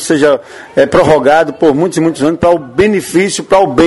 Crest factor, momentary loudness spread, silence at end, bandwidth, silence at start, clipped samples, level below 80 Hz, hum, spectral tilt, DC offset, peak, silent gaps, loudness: 10 dB; 5 LU; 0 s; 12 kHz; 0 s; 0.5%; -40 dBFS; none; -5 dB/octave; under 0.1%; 0 dBFS; none; -10 LUFS